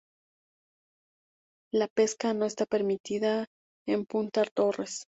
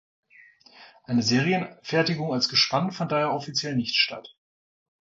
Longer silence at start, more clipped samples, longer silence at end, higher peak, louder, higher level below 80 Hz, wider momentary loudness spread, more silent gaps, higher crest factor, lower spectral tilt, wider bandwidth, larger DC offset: first, 1.75 s vs 0.75 s; neither; second, 0.1 s vs 0.9 s; second, -12 dBFS vs -8 dBFS; second, -29 LUFS vs -24 LUFS; second, -74 dBFS vs -64 dBFS; about the same, 6 LU vs 7 LU; first, 1.90-1.96 s, 3.00-3.04 s, 3.47-3.86 s, 4.51-4.56 s vs none; about the same, 18 dB vs 18 dB; about the same, -4.5 dB/octave vs -4.5 dB/octave; about the same, 8.2 kHz vs 7.8 kHz; neither